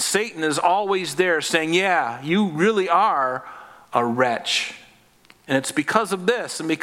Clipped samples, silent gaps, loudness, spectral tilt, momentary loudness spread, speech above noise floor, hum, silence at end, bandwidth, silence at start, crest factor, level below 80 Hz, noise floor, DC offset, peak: under 0.1%; none; -21 LUFS; -3.5 dB/octave; 7 LU; 33 dB; none; 0 s; 16.5 kHz; 0 s; 22 dB; -70 dBFS; -54 dBFS; under 0.1%; 0 dBFS